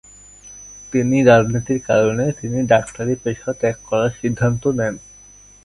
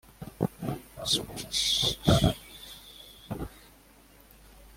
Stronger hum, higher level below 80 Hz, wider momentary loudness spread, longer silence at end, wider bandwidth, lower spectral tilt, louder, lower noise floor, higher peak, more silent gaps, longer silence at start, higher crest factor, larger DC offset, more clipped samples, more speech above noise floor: first, 50 Hz at -50 dBFS vs none; about the same, -46 dBFS vs -46 dBFS; second, 14 LU vs 21 LU; first, 0.65 s vs 0.1 s; second, 11.5 kHz vs 16.5 kHz; first, -6.5 dB/octave vs -4 dB/octave; first, -18 LUFS vs -28 LUFS; second, -46 dBFS vs -56 dBFS; first, 0 dBFS vs -8 dBFS; neither; first, 0.45 s vs 0.2 s; second, 18 dB vs 24 dB; neither; neither; about the same, 28 dB vs 30 dB